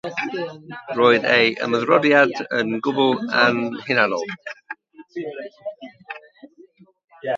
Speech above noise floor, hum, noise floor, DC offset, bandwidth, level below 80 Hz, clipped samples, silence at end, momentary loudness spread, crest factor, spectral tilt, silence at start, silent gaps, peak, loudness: 31 dB; none; -51 dBFS; under 0.1%; 7.6 kHz; -70 dBFS; under 0.1%; 0 s; 21 LU; 22 dB; -5 dB/octave; 0.05 s; 7.04-7.08 s; 0 dBFS; -19 LUFS